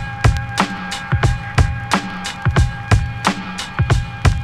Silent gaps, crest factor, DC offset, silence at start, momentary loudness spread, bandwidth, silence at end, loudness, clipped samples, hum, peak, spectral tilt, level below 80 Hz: none; 16 dB; under 0.1%; 0 s; 5 LU; 13.5 kHz; 0 s; -19 LUFS; under 0.1%; none; -2 dBFS; -5.5 dB/octave; -24 dBFS